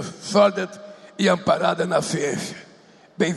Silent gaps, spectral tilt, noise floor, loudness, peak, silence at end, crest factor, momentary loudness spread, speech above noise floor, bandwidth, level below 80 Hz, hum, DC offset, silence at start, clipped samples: none; -4.5 dB/octave; -51 dBFS; -21 LUFS; -6 dBFS; 0 s; 18 dB; 18 LU; 30 dB; 12.5 kHz; -64 dBFS; none; under 0.1%; 0 s; under 0.1%